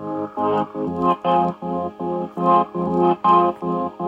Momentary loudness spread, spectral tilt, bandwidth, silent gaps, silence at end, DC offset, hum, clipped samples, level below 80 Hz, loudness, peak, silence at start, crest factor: 10 LU; -9 dB/octave; 7.6 kHz; none; 0 s; under 0.1%; none; under 0.1%; -60 dBFS; -20 LUFS; -4 dBFS; 0 s; 16 dB